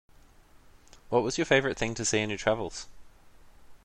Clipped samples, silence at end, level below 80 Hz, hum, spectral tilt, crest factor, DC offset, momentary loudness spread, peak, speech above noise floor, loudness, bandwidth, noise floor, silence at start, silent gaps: under 0.1%; 0.1 s; -54 dBFS; none; -3.5 dB/octave; 22 dB; under 0.1%; 13 LU; -8 dBFS; 28 dB; -28 LUFS; 12 kHz; -56 dBFS; 1.05 s; none